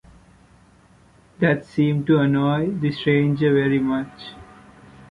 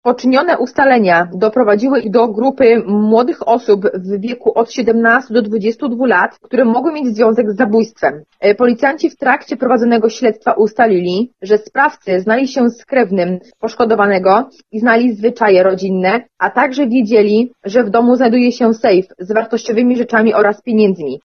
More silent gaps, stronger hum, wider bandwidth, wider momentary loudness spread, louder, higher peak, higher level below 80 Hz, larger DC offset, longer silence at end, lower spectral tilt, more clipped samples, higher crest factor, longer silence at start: neither; neither; first, 9.4 kHz vs 6.8 kHz; about the same, 8 LU vs 6 LU; second, -20 LUFS vs -13 LUFS; second, -4 dBFS vs 0 dBFS; first, -54 dBFS vs -60 dBFS; second, under 0.1% vs 0.1%; first, 0.7 s vs 0.1 s; first, -8.5 dB/octave vs -6.5 dB/octave; neither; first, 18 dB vs 12 dB; first, 1.4 s vs 0.05 s